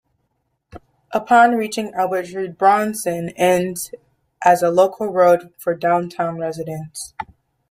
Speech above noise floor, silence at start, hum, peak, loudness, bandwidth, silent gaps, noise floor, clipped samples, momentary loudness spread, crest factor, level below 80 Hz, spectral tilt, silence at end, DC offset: 53 dB; 0.75 s; none; -2 dBFS; -18 LUFS; 16 kHz; none; -71 dBFS; under 0.1%; 15 LU; 18 dB; -60 dBFS; -5 dB/octave; 0.45 s; under 0.1%